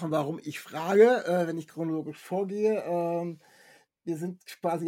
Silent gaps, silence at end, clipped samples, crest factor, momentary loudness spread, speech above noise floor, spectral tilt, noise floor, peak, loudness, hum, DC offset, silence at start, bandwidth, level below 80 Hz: none; 0 s; under 0.1%; 20 dB; 16 LU; 32 dB; -6.5 dB/octave; -59 dBFS; -8 dBFS; -28 LUFS; none; under 0.1%; 0 s; 16.5 kHz; -82 dBFS